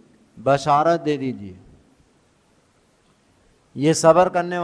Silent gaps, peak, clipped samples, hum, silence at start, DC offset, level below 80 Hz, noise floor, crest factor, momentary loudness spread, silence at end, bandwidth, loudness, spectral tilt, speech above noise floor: none; -2 dBFS; under 0.1%; none; 0.35 s; under 0.1%; -58 dBFS; -60 dBFS; 20 dB; 19 LU; 0 s; 11 kHz; -19 LUFS; -5.5 dB/octave; 42 dB